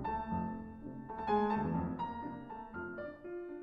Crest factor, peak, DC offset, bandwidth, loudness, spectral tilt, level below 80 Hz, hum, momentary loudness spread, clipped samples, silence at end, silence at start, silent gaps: 18 dB; -20 dBFS; under 0.1%; 5.8 kHz; -39 LUFS; -9.5 dB/octave; -56 dBFS; none; 13 LU; under 0.1%; 0 s; 0 s; none